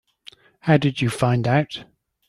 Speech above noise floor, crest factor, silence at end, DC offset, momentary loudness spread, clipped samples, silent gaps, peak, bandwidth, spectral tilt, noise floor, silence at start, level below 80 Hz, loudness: 30 dB; 20 dB; 0.45 s; under 0.1%; 11 LU; under 0.1%; none; -2 dBFS; 12.5 kHz; -6.5 dB/octave; -49 dBFS; 0.65 s; -54 dBFS; -21 LUFS